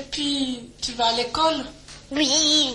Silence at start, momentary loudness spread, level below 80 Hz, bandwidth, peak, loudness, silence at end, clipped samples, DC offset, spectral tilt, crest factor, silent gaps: 0 s; 13 LU; -50 dBFS; 11.5 kHz; -8 dBFS; -22 LUFS; 0 s; under 0.1%; under 0.1%; -1.5 dB/octave; 16 dB; none